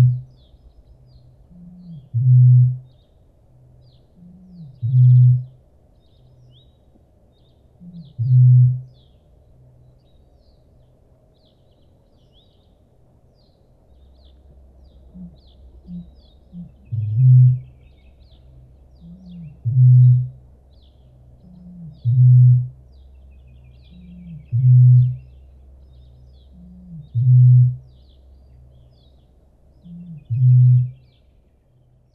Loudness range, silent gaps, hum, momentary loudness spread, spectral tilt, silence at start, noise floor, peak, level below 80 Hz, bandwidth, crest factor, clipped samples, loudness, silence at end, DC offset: 4 LU; none; none; 28 LU; -13 dB/octave; 0 s; -56 dBFS; -6 dBFS; -50 dBFS; 0.7 kHz; 14 dB; under 0.1%; -15 LUFS; 1.25 s; under 0.1%